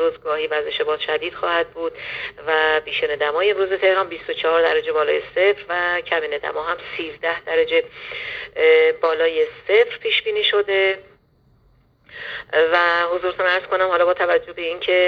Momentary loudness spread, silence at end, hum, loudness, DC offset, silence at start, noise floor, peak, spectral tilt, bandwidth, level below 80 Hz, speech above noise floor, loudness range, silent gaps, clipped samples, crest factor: 10 LU; 0 s; none; -19 LUFS; under 0.1%; 0 s; -57 dBFS; -4 dBFS; -4.5 dB/octave; 6 kHz; -58 dBFS; 38 dB; 3 LU; none; under 0.1%; 16 dB